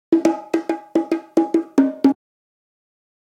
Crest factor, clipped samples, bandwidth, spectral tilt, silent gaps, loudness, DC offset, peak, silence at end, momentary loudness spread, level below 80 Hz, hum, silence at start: 18 dB; under 0.1%; 10.5 kHz; -6 dB/octave; none; -20 LUFS; under 0.1%; -2 dBFS; 1.15 s; 6 LU; -68 dBFS; none; 0.1 s